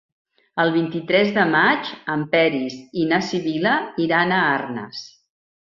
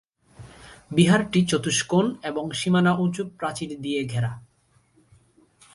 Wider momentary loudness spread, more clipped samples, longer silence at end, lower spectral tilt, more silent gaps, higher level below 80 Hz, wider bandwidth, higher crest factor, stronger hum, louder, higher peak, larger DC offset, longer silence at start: about the same, 11 LU vs 11 LU; neither; second, 0.7 s vs 1.35 s; about the same, -6 dB/octave vs -5 dB/octave; neither; second, -64 dBFS vs -58 dBFS; second, 7.4 kHz vs 11.5 kHz; about the same, 18 dB vs 20 dB; neither; first, -20 LUFS vs -23 LUFS; about the same, -4 dBFS vs -4 dBFS; neither; first, 0.55 s vs 0.4 s